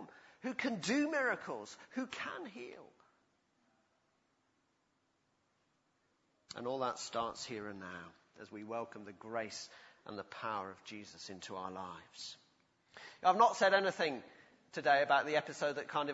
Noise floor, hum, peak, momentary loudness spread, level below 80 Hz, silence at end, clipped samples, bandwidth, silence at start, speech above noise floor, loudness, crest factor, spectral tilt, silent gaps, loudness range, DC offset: -79 dBFS; none; -16 dBFS; 21 LU; -82 dBFS; 0 s; under 0.1%; 7.6 kHz; 0 s; 42 dB; -36 LUFS; 24 dB; -2 dB/octave; none; 15 LU; under 0.1%